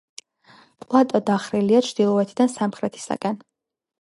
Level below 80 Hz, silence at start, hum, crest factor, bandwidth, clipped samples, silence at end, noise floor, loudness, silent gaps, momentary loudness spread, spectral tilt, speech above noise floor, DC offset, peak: -68 dBFS; 0.9 s; none; 20 dB; 11.5 kHz; under 0.1%; 0.65 s; -54 dBFS; -21 LUFS; none; 9 LU; -6 dB/octave; 33 dB; under 0.1%; -2 dBFS